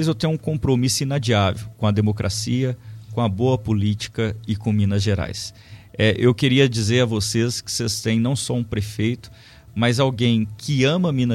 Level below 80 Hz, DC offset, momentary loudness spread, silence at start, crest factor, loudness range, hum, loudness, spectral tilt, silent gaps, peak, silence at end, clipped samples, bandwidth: -46 dBFS; under 0.1%; 8 LU; 0 s; 18 dB; 3 LU; none; -21 LUFS; -5.5 dB/octave; none; -2 dBFS; 0 s; under 0.1%; 14.5 kHz